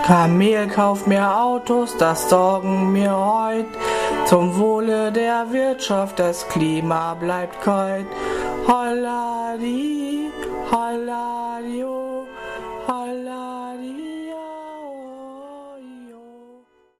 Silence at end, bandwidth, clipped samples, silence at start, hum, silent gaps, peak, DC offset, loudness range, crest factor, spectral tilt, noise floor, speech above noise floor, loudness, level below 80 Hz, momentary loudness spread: 0.55 s; 14 kHz; under 0.1%; 0 s; none; none; 0 dBFS; under 0.1%; 12 LU; 20 dB; -5.5 dB/octave; -52 dBFS; 33 dB; -20 LUFS; -52 dBFS; 16 LU